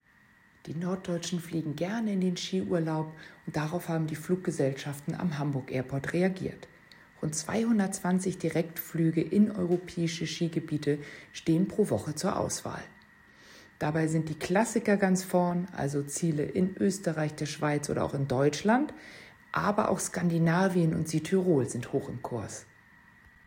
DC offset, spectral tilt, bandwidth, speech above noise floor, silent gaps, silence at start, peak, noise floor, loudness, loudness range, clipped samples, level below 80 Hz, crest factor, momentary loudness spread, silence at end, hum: under 0.1%; -6 dB/octave; 16 kHz; 32 dB; none; 0.65 s; -12 dBFS; -61 dBFS; -30 LUFS; 4 LU; under 0.1%; -64 dBFS; 18 dB; 10 LU; 0.85 s; none